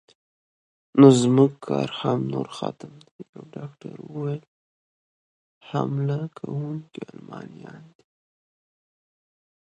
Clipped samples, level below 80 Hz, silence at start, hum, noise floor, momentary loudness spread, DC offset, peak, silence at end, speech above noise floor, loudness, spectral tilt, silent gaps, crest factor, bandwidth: under 0.1%; -68 dBFS; 0.95 s; none; under -90 dBFS; 25 LU; under 0.1%; -2 dBFS; 1.95 s; over 67 dB; -22 LUFS; -7 dB/octave; 3.11-3.19 s, 3.29-3.33 s, 4.48-5.61 s; 24 dB; 10.5 kHz